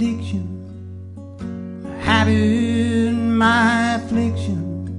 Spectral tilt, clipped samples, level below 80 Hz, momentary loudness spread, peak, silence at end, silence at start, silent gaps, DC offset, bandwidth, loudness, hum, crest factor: -6 dB/octave; under 0.1%; -48 dBFS; 19 LU; -4 dBFS; 0 s; 0 s; none; under 0.1%; 10.5 kHz; -18 LUFS; none; 16 dB